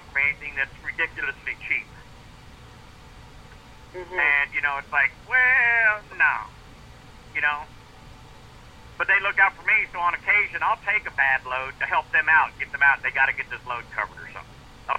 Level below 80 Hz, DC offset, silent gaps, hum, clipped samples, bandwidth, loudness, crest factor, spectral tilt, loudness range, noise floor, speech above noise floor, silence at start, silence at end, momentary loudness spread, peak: -50 dBFS; under 0.1%; none; none; under 0.1%; 13.5 kHz; -22 LUFS; 20 dB; -3.5 dB/octave; 7 LU; -46 dBFS; 22 dB; 0.05 s; 0 s; 14 LU; -6 dBFS